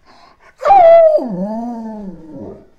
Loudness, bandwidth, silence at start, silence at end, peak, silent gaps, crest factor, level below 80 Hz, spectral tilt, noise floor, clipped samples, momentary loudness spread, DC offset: -10 LUFS; 7.2 kHz; 0.6 s; 0.2 s; 0 dBFS; none; 12 dB; -48 dBFS; -7.5 dB/octave; -45 dBFS; under 0.1%; 26 LU; under 0.1%